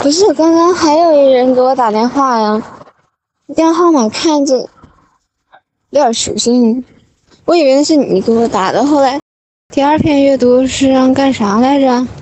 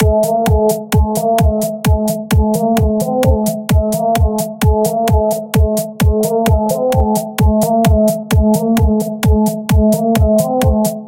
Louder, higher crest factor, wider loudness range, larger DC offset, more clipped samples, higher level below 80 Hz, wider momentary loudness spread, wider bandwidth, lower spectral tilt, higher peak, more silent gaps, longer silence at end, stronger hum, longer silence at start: first, -11 LUFS vs -14 LUFS; about the same, 10 dB vs 12 dB; first, 4 LU vs 1 LU; neither; neither; second, -46 dBFS vs -20 dBFS; first, 6 LU vs 3 LU; second, 8.8 kHz vs 17.5 kHz; second, -4.5 dB/octave vs -6.5 dB/octave; about the same, 0 dBFS vs 0 dBFS; first, 9.22-9.69 s vs none; about the same, 0 s vs 0 s; neither; about the same, 0 s vs 0 s